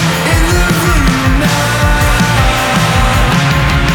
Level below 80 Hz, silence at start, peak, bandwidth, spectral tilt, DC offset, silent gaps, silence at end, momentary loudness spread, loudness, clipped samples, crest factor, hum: -16 dBFS; 0 s; 0 dBFS; over 20 kHz; -4.5 dB/octave; under 0.1%; none; 0 s; 1 LU; -11 LUFS; under 0.1%; 10 dB; none